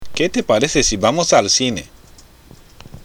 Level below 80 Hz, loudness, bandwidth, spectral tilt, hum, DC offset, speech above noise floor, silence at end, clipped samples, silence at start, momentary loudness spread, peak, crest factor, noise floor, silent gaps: -38 dBFS; -15 LUFS; 19.5 kHz; -3 dB/octave; none; under 0.1%; 28 dB; 0 s; under 0.1%; 0 s; 7 LU; 0 dBFS; 18 dB; -44 dBFS; none